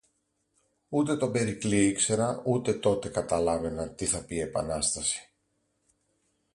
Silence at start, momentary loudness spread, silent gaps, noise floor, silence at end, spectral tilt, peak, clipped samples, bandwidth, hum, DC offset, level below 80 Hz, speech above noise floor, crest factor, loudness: 0.9 s; 6 LU; none; -75 dBFS; 1.3 s; -4.5 dB/octave; -10 dBFS; under 0.1%; 11.5 kHz; none; under 0.1%; -52 dBFS; 47 dB; 18 dB; -28 LUFS